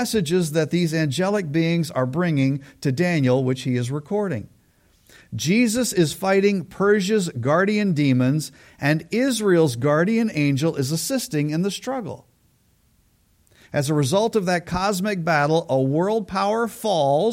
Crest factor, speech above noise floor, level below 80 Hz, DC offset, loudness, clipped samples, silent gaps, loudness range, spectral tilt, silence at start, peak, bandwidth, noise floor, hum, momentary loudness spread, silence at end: 16 dB; 41 dB; -54 dBFS; under 0.1%; -21 LUFS; under 0.1%; none; 5 LU; -5.5 dB/octave; 0 s; -6 dBFS; 16.5 kHz; -61 dBFS; none; 7 LU; 0 s